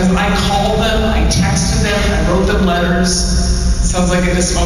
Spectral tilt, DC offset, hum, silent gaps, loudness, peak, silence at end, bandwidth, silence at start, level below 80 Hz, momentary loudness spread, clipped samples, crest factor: -4.5 dB/octave; 0.5%; none; none; -14 LUFS; -4 dBFS; 0 s; 13.5 kHz; 0 s; -18 dBFS; 2 LU; under 0.1%; 8 dB